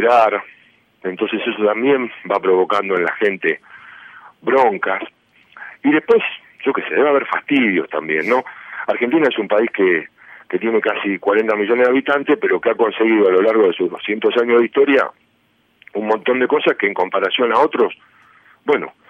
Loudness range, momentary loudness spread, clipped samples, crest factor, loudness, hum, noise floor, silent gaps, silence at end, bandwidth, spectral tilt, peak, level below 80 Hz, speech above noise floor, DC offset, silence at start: 3 LU; 10 LU; under 0.1%; 14 dB; -17 LUFS; none; -60 dBFS; none; 0.2 s; 6.6 kHz; -6.5 dB/octave; -2 dBFS; -66 dBFS; 44 dB; under 0.1%; 0 s